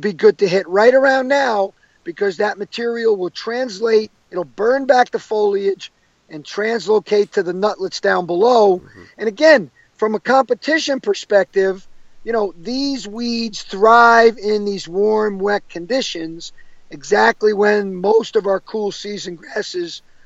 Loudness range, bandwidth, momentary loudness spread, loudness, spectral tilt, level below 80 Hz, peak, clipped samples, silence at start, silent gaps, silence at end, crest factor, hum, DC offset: 4 LU; 8 kHz; 15 LU; -17 LUFS; -4 dB/octave; -54 dBFS; 0 dBFS; under 0.1%; 0 s; none; 0.25 s; 16 dB; none; under 0.1%